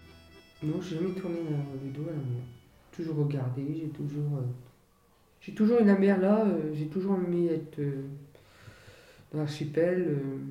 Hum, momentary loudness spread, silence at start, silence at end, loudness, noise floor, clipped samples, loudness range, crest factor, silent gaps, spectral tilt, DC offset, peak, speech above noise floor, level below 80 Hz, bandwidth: none; 15 LU; 0.05 s; 0 s; -30 LUFS; -64 dBFS; under 0.1%; 8 LU; 18 dB; none; -9 dB/octave; under 0.1%; -12 dBFS; 35 dB; -66 dBFS; 10.5 kHz